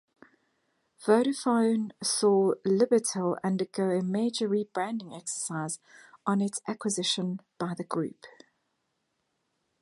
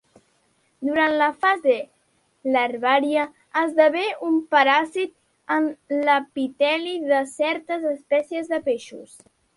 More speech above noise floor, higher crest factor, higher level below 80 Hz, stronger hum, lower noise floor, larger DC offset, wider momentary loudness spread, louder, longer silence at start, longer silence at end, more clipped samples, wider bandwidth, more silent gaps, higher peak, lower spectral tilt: first, 50 dB vs 44 dB; about the same, 20 dB vs 20 dB; second, -80 dBFS vs -72 dBFS; neither; first, -78 dBFS vs -66 dBFS; neither; about the same, 11 LU vs 10 LU; second, -28 LUFS vs -22 LUFS; first, 1 s vs 0.8 s; first, 1.55 s vs 0.5 s; neither; about the same, 11.5 kHz vs 11.5 kHz; neither; second, -8 dBFS vs -4 dBFS; first, -4.5 dB/octave vs -3 dB/octave